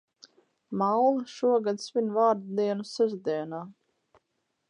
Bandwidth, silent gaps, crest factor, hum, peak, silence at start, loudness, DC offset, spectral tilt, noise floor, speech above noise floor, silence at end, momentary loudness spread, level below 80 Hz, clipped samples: 10.5 kHz; none; 18 dB; none; -12 dBFS; 0.7 s; -27 LUFS; under 0.1%; -6 dB/octave; -79 dBFS; 52 dB; 1 s; 12 LU; -82 dBFS; under 0.1%